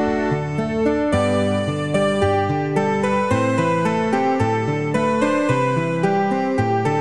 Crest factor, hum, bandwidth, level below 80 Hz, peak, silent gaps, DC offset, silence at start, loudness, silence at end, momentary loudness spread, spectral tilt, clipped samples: 14 dB; none; 11.5 kHz; -46 dBFS; -4 dBFS; none; 0.5%; 0 s; -19 LUFS; 0 s; 3 LU; -6.5 dB/octave; under 0.1%